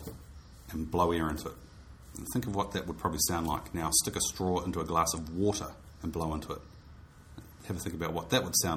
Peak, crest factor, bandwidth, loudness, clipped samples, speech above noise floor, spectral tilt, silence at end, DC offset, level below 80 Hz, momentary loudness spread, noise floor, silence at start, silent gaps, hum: -12 dBFS; 20 dB; 19.5 kHz; -32 LUFS; under 0.1%; 20 dB; -3.5 dB/octave; 0 s; under 0.1%; -48 dBFS; 21 LU; -52 dBFS; 0 s; none; none